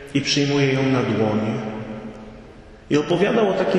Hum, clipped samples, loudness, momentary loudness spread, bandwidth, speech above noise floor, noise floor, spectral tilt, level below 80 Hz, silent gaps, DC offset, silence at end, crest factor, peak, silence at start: none; under 0.1%; -20 LUFS; 16 LU; 10.5 kHz; 24 dB; -43 dBFS; -5.5 dB/octave; -50 dBFS; none; under 0.1%; 0 s; 14 dB; -6 dBFS; 0 s